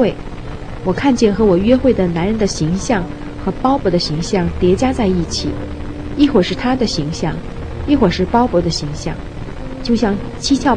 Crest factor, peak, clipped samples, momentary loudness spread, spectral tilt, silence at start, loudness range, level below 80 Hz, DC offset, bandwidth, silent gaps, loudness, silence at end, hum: 16 dB; 0 dBFS; under 0.1%; 14 LU; -6 dB/octave; 0 s; 2 LU; -28 dBFS; under 0.1%; 10 kHz; none; -16 LUFS; 0 s; none